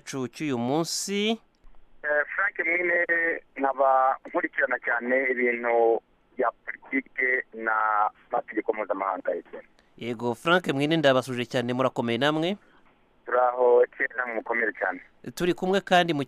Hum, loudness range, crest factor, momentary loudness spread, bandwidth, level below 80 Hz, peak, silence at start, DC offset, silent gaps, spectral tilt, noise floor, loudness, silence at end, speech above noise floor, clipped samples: none; 3 LU; 16 dB; 10 LU; 15 kHz; -64 dBFS; -10 dBFS; 0.05 s; under 0.1%; none; -4.5 dB/octave; -60 dBFS; -25 LUFS; 0 s; 34 dB; under 0.1%